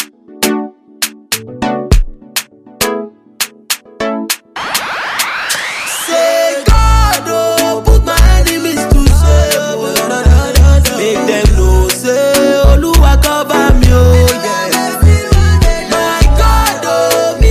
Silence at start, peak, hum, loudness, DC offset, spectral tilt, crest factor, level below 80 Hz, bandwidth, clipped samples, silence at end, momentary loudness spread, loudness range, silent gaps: 0 s; 0 dBFS; none; -11 LUFS; under 0.1%; -4.5 dB/octave; 10 dB; -12 dBFS; 16 kHz; 0.4%; 0 s; 10 LU; 8 LU; none